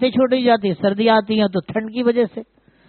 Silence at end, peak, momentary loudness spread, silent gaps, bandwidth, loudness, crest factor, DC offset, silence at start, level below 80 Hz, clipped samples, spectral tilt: 0.45 s; -4 dBFS; 8 LU; none; 4.5 kHz; -18 LUFS; 14 dB; under 0.1%; 0 s; -58 dBFS; under 0.1%; -4 dB/octave